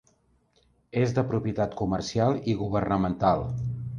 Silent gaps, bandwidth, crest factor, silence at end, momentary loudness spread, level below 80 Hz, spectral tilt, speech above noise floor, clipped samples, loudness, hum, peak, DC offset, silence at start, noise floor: none; 7.4 kHz; 18 dB; 0 s; 5 LU; -48 dBFS; -7.5 dB/octave; 40 dB; under 0.1%; -27 LUFS; none; -8 dBFS; under 0.1%; 0.95 s; -66 dBFS